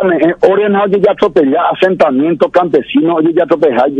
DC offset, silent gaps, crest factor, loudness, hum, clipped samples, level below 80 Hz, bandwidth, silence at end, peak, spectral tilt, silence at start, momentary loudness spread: under 0.1%; none; 10 dB; -11 LUFS; none; 0.8%; -50 dBFS; 7.6 kHz; 0 s; 0 dBFS; -7.5 dB/octave; 0 s; 2 LU